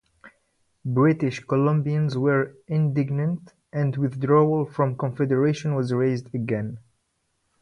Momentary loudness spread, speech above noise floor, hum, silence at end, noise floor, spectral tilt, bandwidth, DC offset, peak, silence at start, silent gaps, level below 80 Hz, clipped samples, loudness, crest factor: 8 LU; 50 dB; none; 0.85 s; -73 dBFS; -8.5 dB/octave; 9.4 kHz; under 0.1%; -6 dBFS; 0.25 s; none; -62 dBFS; under 0.1%; -24 LUFS; 18 dB